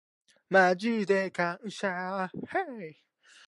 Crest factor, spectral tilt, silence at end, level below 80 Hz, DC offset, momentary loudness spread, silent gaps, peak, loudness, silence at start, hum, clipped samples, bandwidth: 22 dB; -5.5 dB/octave; 0.55 s; -78 dBFS; under 0.1%; 13 LU; none; -8 dBFS; -29 LUFS; 0.5 s; none; under 0.1%; 11.5 kHz